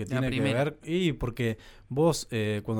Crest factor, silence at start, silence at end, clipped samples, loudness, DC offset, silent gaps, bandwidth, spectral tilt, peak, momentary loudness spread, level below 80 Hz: 14 dB; 0 s; 0 s; under 0.1%; -29 LUFS; under 0.1%; none; 18 kHz; -6 dB/octave; -14 dBFS; 6 LU; -48 dBFS